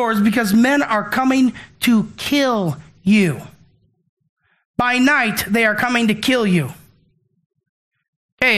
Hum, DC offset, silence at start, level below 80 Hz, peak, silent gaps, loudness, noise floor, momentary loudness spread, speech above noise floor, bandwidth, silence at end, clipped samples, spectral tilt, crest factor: none; under 0.1%; 0 s; -52 dBFS; 0 dBFS; 4.09-4.17 s, 4.29-4.37 s, 4.65-4.74 s, 7.46-7.50 s, 7.69-7.91 s, 8.08-8.38 s; -17 LUFS; -60 dBFS; 7 LU; 44 dB; 15 kHz; 0 s; under 0.1%; -5 dB/octave; 18 dB